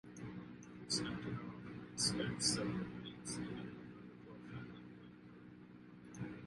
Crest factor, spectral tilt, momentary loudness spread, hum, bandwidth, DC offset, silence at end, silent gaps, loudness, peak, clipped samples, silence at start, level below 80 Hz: 24 dB; -3.5 dB/octave; 21 LU; none; 11.5 kHz; under 0.1%; 0 s; none; -42 LUFS; -20 dBFS; under 0.1%; 0.05 s; -68 dBFS